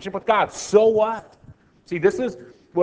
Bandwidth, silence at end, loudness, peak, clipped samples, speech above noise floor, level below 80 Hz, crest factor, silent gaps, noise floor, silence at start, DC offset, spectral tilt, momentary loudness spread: 8 kHz; 0 s; -21 LUFS; -4 dBFS; under 0.1%; 29 dB; -58 dBFS; 18 dB; none; -50 dBFS; 0 s; under 0.1%; -5 dB/octave; 13 LU